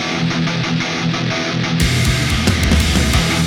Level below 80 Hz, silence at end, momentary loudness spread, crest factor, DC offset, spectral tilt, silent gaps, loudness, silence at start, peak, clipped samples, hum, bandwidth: -24 dBFS; 0 s; 4 LU; 14 dB; under 0.1%; -4.5 dB/octave; none; -16 LUFS; 0 s; -2 dBFS; under 0.1%; none; 18.5 kHz